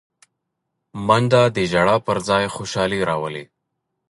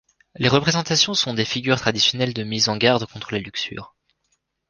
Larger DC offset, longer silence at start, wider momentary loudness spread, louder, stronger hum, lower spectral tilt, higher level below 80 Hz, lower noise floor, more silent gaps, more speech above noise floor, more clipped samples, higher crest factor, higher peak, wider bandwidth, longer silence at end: neither; first, 0.95 s vs 0.4 s; about the same, 12 LU vs 11 LU; about the same, -19 LUFS vs -20 LUFS; neither; first, -5.5 dB/octave vs -3.5 dB/octave; about the same, -50 dBFS vs -54 dBFS; first, -77 dBFS vs -71 dBFS; neither; first, 59 dB vs 50 dB; neither; about the same, 18 dB vs 22 dB; about the same, -2 dBFS vs -2 dBFS; about the same, 11.5 kHz vs 10.5 kHz; second, 0.65 s vs 0.8 s